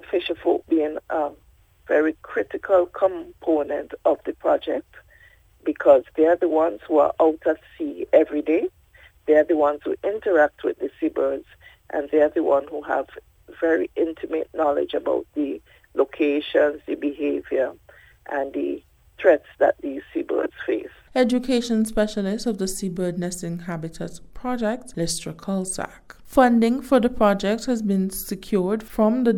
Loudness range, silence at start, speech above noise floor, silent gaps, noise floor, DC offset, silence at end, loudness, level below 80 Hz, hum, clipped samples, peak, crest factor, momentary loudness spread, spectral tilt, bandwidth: 4 LU; 0.1 s; 32 dB; none; -53 dBFS; under 0.1%; 0 s; -23 LUFS; -50 dBFS; none; under 0.1%; -2 dBFS; 20 dB; 11 LU; -5.5 dB/octave; 17 kHz